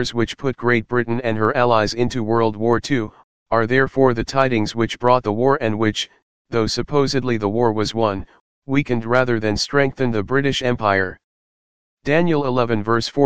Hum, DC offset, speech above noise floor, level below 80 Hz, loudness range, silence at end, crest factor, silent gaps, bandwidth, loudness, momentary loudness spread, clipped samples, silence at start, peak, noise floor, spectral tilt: none; 2%; over 72 dB; -44 dBFS; 2 LU; 0 s; 18 dB; 3.24-3.46 s, 6.22-6.45 s, 8.40-8.62 s, 11.24-11.97 s; 9.6 kHz; -19 LUFS; 5 LU; under 0.1%; 0 s; 0 dBFS; under -90 dBFS; -5.5 dB/octave